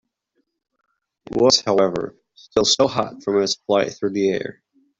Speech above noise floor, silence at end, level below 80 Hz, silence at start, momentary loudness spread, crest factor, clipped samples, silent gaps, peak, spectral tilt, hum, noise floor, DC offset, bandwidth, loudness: 53 dB; 0.5 s; -56 dBFS; 1.3 s; 13 LU; 20 dB; under 0.1%; none; -2 dBFS; -3.5 dB/octave; none; -72 dBFS; under 0.1%; 7.8 kHz; -19 LUFS